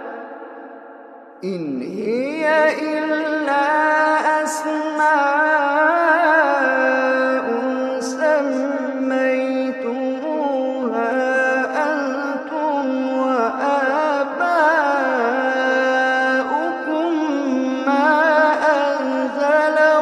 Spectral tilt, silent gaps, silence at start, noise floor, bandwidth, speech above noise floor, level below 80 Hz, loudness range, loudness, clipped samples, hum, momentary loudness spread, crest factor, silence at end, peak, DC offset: -4 dB/octave; none; 0 s; -40 dBFS; 12.5 kHz; 20 dB; -78 dBFS; 4 LU; -18 LUFS; under 0.1%; none; 8 LU; 16 dB; 0 s; -2 dBFS; under 0.1%